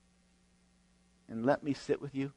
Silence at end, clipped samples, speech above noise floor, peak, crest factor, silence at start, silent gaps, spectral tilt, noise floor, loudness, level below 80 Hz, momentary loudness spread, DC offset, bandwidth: 0.05 s; under 0.1%; 35 dB; -16 dBFS; 20 dB; 1.3 s; none; -7 dB/octave; -69 dBFS; -35 LUFS; -70 dBFS; 5 LU; under 0.1%; 10.5 kHz